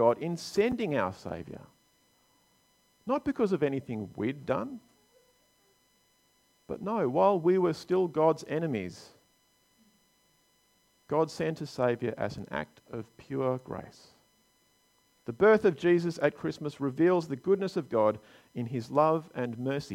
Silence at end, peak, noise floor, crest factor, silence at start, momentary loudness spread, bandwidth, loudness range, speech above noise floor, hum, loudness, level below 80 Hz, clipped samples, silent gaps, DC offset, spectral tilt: 0 s; -10 dBFS; -69 dBFS; 20 dB; 0 s; 17 LU; 15 kHz; 8 LU; 40 dB; none; -29 LUFS; -66 dBFS; under 0.1%; none; under 0.1%; -7 dB/octave